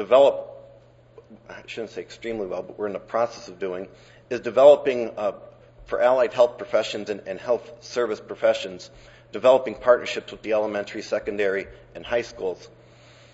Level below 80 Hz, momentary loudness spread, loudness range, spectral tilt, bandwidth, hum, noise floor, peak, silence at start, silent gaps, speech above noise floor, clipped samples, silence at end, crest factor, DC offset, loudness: -58 dBFS; 18 LU; 10 LU; -4.5 dB/octave; 8 kHz; none; -52 dBFS; -2 dBFS; 0 s; none; 29 dB; under 0.1%; 0.7 s; 22 dB; under 0.1%; -23 LUFS